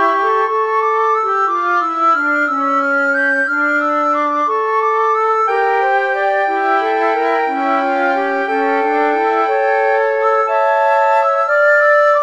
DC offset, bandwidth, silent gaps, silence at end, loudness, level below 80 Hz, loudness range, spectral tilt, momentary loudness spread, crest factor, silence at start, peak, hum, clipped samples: 0.2%; 8.4 kHz; none; 0 s; -14 LUFS; -74 dBFS; 2 LU; -2.5 dB/octave; 3 LU; 12 dB; 0 s; -2 dBFS; none; under 0.1%